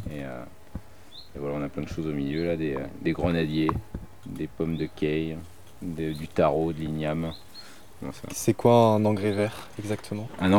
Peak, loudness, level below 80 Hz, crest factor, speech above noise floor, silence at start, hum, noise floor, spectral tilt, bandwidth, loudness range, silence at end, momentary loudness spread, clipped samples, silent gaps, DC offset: -6 dBFS; -27 LUFS; -48 dBFS; 22 dB; 22 dB; 0 s; none; -49 dBFS; -6.5 dB/octave; 19.5 kHz; 5 LU; 0 s; 19 LU; under 0.1%; none; 0.6%